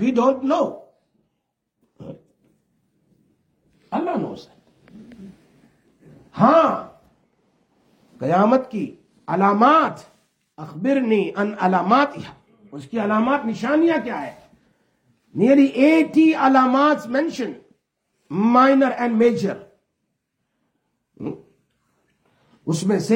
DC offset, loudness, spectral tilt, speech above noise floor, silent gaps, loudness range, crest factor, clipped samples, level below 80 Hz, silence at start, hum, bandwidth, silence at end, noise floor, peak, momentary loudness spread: under 0.1%; -19 LUFS; -6.5 dB/octave; 58 dB; none; 14 LU; 20 dB; under 0.1%; -68 dBFS; 0 s; none; 11 kHz; 0 s; -76 dBFS; -2 dBFS; 21 LU